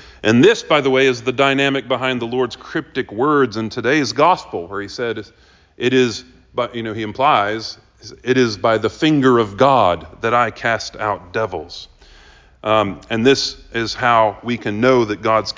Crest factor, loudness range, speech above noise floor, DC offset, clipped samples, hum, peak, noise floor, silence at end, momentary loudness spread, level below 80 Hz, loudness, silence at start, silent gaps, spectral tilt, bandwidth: 16 dB; 4 LU; 29 dB; under 0.1%; under 0.1%; none; -2 dBFS; -46 dBFS; 0.05 s; 12 LU; -48 dBFS; -17 LUFS; 0.05 s; none; -5 dB/octave; 7.6 kHz